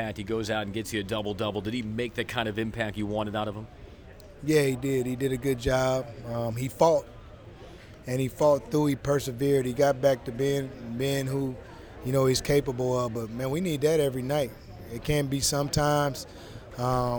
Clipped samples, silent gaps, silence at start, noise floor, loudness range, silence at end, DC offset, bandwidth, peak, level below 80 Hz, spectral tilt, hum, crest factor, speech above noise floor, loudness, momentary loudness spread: under 0.1%; none; 0 s; -47 dBFS; 4 LU; 0 s; under 0.1%; over 20 kHz; -8 dBFS; -48 dBFS; -5.5 dB/octave; none; 20 dB; 20 dB; -28 LUFS; 16 LU